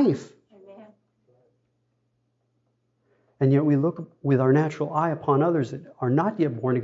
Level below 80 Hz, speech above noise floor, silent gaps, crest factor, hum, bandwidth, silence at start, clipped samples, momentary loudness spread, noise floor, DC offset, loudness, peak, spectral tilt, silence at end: -74 dBFS; 50 dB; none; 16 dB; none; 7.8 kHz; 0 s; under 0.1%; 9 LU; -72 dBFS; under 0.1%; -24 LUFS; -8 dBFS; -9.5 dB/octave; 0 s